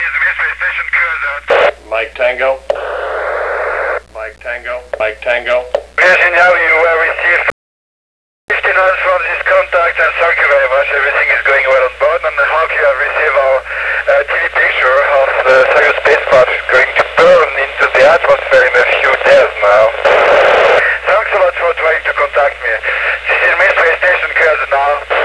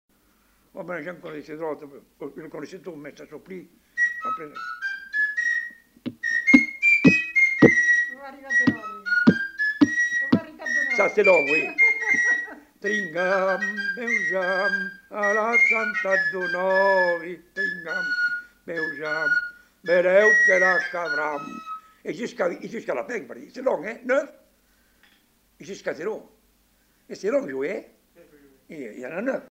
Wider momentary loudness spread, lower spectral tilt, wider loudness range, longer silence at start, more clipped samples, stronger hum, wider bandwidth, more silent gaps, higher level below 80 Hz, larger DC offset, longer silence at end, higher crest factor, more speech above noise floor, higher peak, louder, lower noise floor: second, 9 LU vs 21 LU; second, -3 dB/octave vs -5 dB/octave; second, 6 LU vs 13 LU; second, 0 s vs 0.75 s; neither; neither; second, 11 kHz vs 16 kHz; first, 7.52-8.48 s vs none; first, -40 dBFS vs -64 dBFS; first, 0.3% vs under 0.1%; about the same, 0 s vs 0.05 s; second, 10 dB vs 22 dB; first, over 79 dB vs 39 dB; about the same, -2 dBFS vs -2 dBFS; first, -10 LUFS vs -21 LUFS; first, under -90 dBFS vs -63 dBFS